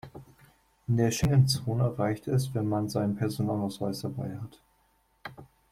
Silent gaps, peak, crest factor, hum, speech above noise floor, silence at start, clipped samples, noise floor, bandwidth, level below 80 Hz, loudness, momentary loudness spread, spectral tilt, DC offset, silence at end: none; -12 dBFS; 18 dB; none; 41 dB; 0.05 s; under 0.1%; -69 dBFS; 15.5 kHz; -52 dBFS; -29 LUFS; 21 LU; -6.5 dB/octave; under 0.1%; 0.25 s